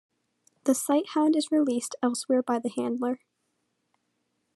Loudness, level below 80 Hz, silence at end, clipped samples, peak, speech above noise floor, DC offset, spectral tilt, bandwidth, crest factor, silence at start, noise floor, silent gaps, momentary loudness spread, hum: -27 LUFS; -88 dBFS; 1.4 s; under 0.1%; -10 dBFS; 51 dB; under 0.1%; -3.5 dB/octave; 13 kHz; 18 dB; 0.65 s; -77 dBFS; none; 7 LU; none